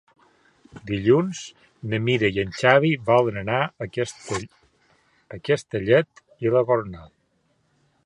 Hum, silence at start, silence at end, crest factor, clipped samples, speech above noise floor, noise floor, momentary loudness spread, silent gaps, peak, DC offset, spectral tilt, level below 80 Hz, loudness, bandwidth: none; 0.75 s; 1 s; 22 dB; under 0.1%; 45 dB; -67 dBFS; 19 LU; none; -2 dBFS; under 0.1%; -6 dB/octave; -54 dBFS; -22 LUFS; 11 kHz